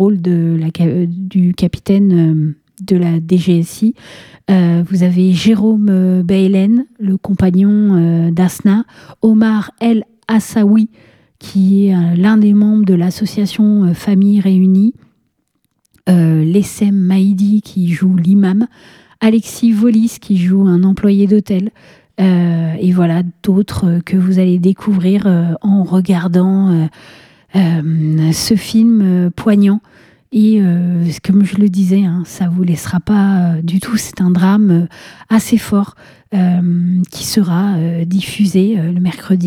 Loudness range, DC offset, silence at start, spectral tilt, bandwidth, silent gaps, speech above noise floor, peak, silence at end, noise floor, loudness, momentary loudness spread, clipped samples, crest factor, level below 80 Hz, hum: 2 LU; under 0.1%; 0 s; -7.5 dB/octave; 15 kHz; none; 53 dB; 0 dBFS; 0 s; -65 dBFS; -12 LUFS; 6 LU; under 0.1%; 12 dB; -48 dBFS; none